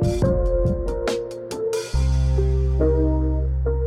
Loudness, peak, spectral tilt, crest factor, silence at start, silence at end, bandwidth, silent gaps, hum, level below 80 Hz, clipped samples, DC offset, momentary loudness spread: -22 LUFS; -8 dBFS; -7.5 dB/octave; 12 dB; 0 s; 0 s; 11.5 kHz; none; none; -22 dBFS; under 0.1%; under 0.1%; 6 LU